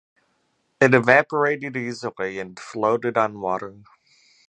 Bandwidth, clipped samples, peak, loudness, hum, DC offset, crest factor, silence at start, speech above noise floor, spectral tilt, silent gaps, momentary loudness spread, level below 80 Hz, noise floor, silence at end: 9.6 kHz; under 0.1%; 0 dBFS; -21 LUFS; none; under 0.1%; 22 dB; 0.8 s; 48 dB; -6 dB/octave; none; 14 LU; -66 dBFS; -69 dBFS; 0.75 s